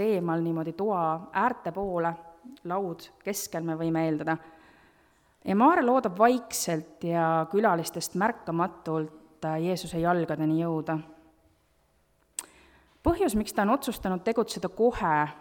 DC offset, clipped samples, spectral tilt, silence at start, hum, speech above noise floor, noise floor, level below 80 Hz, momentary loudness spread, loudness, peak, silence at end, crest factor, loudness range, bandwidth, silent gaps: under 0.1%; under 0.1%; -5.5 dB/octave; 0 s; none; 40 dB; -67 dBFS; -52 dBFS; 11 LU; -28 LUFS; -8 dBFS; 0 s; 20 dB; 6 LU; 19 kHz; none